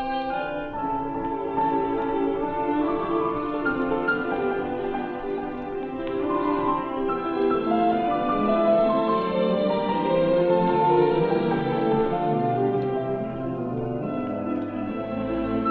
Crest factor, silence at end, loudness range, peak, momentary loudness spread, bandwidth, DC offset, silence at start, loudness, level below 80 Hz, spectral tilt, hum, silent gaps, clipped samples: 16 dB; 0 s; 5 LU; -8 dBFS; 9 LU; 5 kHz; under 0.1%; 0 s; -25 LUFS; -48 dBFS; -9.5 dB/octave; none; none; under 0.1%